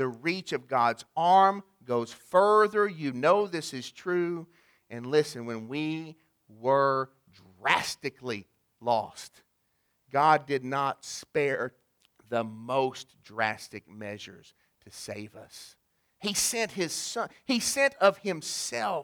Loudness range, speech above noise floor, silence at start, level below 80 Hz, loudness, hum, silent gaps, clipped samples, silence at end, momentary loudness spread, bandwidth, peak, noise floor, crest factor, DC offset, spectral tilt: 9 LU; 46 dB; 0 s; -72 dBFS; -28 LUFS; none; none; under 0.1%; 0 s; 18 LU; over 20 kHz; -6 dBFS; -75 dBFS; 24 dB; under 0.1%; -3.5 dB/octave